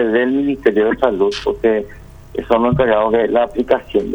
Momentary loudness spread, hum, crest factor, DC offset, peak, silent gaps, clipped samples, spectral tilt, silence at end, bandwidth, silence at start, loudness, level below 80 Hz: 5 LU; none; 16 dB; under 0.1%; 0 dBFS; none; under 0.1%; -7 dB/octave; 0 s; 19.5 kHz; 0 s; -16 LUFS; -40 dBFS